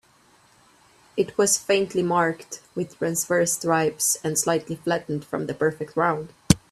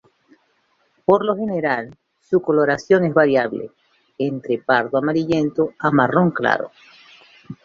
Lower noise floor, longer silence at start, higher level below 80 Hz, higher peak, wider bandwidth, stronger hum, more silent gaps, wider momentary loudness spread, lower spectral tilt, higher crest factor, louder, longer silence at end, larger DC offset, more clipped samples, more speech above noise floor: second, -58 dBFS vs -64 dBFS; about the same, 1.15 s vs 1.1 s; first, -50 dBFS vs -60 dBFS; about the same, 0 dBFS vs 0 dBFS; first, 15.5 kHz vs 7.4 kHz; neither; neither; about the same, 10 LU vs 10 LU; second, -4 dB/octave vs -7.5 dB/octave; about the same, 24 dB vs 20 dB; second, -24 LUFS vs -19 LUFS; about the same, 0.15 s vs 0.1 s; neither; neither; second, 34 dB vs 46 dB